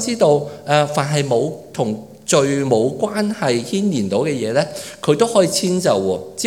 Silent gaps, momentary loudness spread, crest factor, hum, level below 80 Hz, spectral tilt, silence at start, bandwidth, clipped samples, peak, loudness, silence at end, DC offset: none; 8 LU; 18 dB; none; -64 dBFS; -5 dB/octave; 0 s; 17.5 kHz; under 0.1%; 0 dBFS; -18 LUFS; 0 s; 0.1%